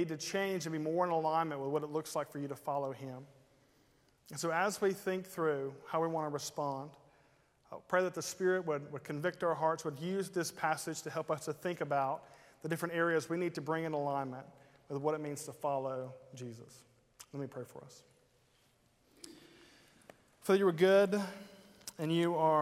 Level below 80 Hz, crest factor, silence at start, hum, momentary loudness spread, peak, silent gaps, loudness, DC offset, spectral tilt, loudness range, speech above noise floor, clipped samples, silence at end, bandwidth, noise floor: -80 dBFS; 20 dB; 0 s; none; 16 LU; -16 dBFS; none; -35 LUFS; under 0.1%; -5 dB/octave; 10 LU; 36 dB; under 0.1%; 0 s; 16 kHz; -71 dBFS